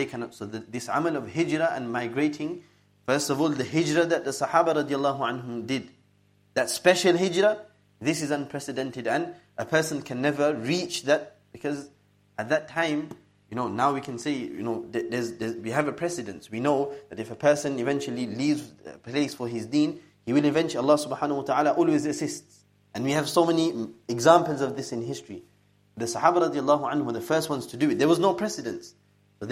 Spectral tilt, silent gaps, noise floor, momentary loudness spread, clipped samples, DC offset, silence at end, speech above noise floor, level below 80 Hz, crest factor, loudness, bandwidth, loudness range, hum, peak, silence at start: -5 dB/octave; none; -63 dBFS; 13 LU; under 0.1%; under 0.1%; 0 s; 37 dB; -70 dBFS; 24 dB; -26 LUFS; 16 kHz; 4 LU; 50 Hz at -60 dBFS; -2 dBFS; 0 s